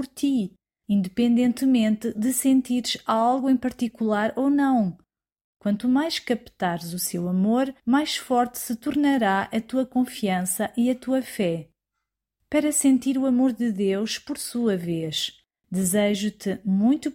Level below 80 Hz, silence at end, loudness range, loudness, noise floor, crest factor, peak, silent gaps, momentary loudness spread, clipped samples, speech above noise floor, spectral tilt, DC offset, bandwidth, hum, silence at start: -62 dBFS; 0 s; 3 LU; -24 LUFS; -83 dBFS; 14 dB; -10 dBFS; 5.41-5.53 s; 7 LU; under 0.1%; 60 dB; -4.5 dB/octave; under 0.1%; 16.5 kHz; none; 0 s